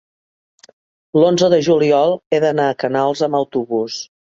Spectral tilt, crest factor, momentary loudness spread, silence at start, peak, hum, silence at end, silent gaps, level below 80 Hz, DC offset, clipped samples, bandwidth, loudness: -5.5 dB/octave; 16 dB; 8 LU; 1.15 s; -2 dBFS; none; 0.25 s; 2.26-2.31 s; -62 dBFS; under 0.1%; under 0.1%; 7.6 kHz; -16 LUFS